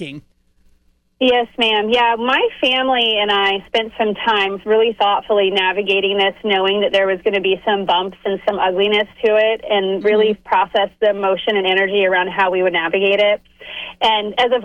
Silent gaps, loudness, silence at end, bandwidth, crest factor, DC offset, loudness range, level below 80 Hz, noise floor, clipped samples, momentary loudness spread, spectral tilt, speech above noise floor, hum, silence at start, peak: none; -16 LUFS; 0 s; 9.2 kHz; 12 dB; under 0.1%; 1 LU; -54 dBFS; -57 dBFS; under 0.1%; 4 LU; -5 dB/octave; 41 dB; none; 0 s; -4 dBFS